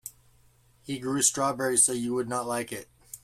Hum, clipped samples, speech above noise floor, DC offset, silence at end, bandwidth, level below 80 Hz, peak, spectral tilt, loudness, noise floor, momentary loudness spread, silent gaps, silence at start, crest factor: none; under 0.1%; 34 dB; under 0.1%; 0.05 s; 16 kHz; -64 dBFS; -8 dBFS; -2.5 dB/octave; -26 LUFS; -61 dBFS; 18 LU; none; 0.05 s; 20 dB